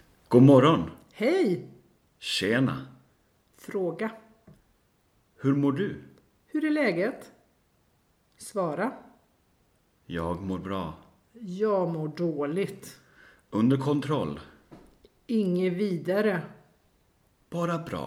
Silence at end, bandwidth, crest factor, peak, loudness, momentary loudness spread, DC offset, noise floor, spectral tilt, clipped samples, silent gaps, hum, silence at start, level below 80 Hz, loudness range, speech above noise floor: 0 s; 15 kHz; 22 dB; -6 dBFS; -27 LUFS; 15 LU; under 0.1%; -68 dBFS; -7 dB/octave; under 0.1%; none; none; 0.3 s; -62 dBFS; 7 LU; 42 dB